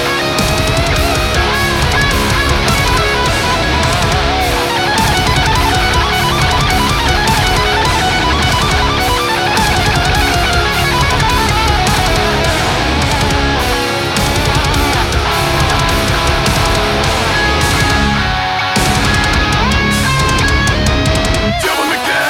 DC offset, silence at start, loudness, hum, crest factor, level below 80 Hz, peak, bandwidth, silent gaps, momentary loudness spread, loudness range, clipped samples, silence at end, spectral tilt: under 0.1%; 0 s; -12 LUFS; none; 12 dB; -20 dBFS; 0 dBFS; 17.5 kHz; none; 2 LU; 1 LU; under 0.1%; 0 s; -4 dB/octave